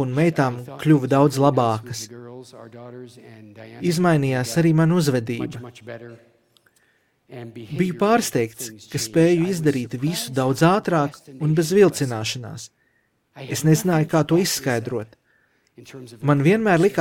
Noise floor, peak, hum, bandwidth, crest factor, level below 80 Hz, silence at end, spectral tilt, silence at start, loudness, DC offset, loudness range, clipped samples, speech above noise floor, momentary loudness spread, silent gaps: -66 dBFS; -4 dBFS; none; 17 kHz; 18 dB; -60 dBFS; 0 s; -6 dB/octave; 0 s; -20 LUFS; under 0.1%; 5 LU; under 0.1%; 46 dB; 22 LU; none